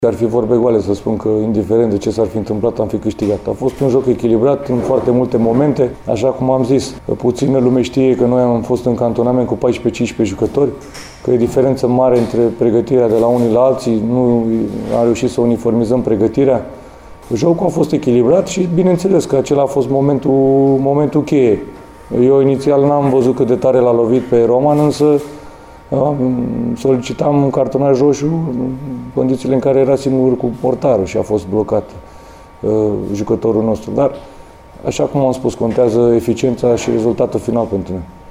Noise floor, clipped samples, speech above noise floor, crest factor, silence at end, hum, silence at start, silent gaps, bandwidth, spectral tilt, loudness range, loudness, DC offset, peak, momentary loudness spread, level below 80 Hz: -37 dBFS; under 0.1%; 24 dB; 12 dB; 0.05 s; none; 0 s; none; 15 kHz; -7.5 dB/octave; 3 LU; -14 LUFS; under 0.1%; -2 dBFS; 6 LU; -42 dBFS